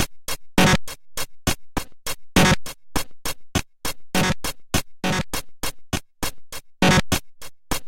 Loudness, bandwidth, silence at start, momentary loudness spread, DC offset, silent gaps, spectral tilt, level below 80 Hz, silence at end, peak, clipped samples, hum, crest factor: -23 LUFS; 17 kHz; 0 s; 14 LU; under 0.1%; none; -4 dB/octave; -36 dBFS; 0 s; -2 dBFS; under 0.1%; none; 20 dB